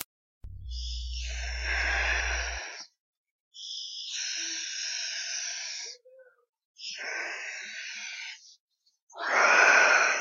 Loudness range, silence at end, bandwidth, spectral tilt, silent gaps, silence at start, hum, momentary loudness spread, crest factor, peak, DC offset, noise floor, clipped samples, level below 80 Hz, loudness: 11 LU; 0 s; 15.5 kHz; -1 dB/octave; 0.05-0.41 s, 3.00-3.24 s, 3.31-3.51 s, 6.49-6.53 s, 6.65-6.75 s, 8.60-8.68 s, 9.02-9.07 s; 0 s; none; 22 LU; 24 dB; -6 dBFS; under 0.1%; -57 dBFS; under 0.1%; -42 dBFS; -28 LUFS